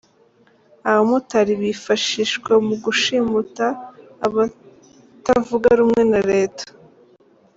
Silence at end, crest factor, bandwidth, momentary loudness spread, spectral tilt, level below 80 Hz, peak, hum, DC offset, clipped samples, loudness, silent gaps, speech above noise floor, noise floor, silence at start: 0.9 s; 16 dB; 7.8 kHz; 10 LU; -4 dB/octave; -54 dBFS; -4 dBFS; none; under 0.1%; under 0.1%; -18 LUFS; none; 38 dB; -55 dBFS; 0.85 s